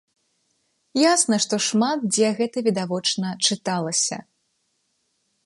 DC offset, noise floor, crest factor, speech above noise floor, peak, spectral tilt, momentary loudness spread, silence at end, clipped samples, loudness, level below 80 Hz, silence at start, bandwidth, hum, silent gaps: under 0.1%; -71 dBFS; 18 dB; 50 dB; -6 dBFS; -3 dB/octave; 6 LU; 1.25 s; under 0.1%; -21 LUFS; -74 dBFS; 0.95 s; 11.5 kHz; none; none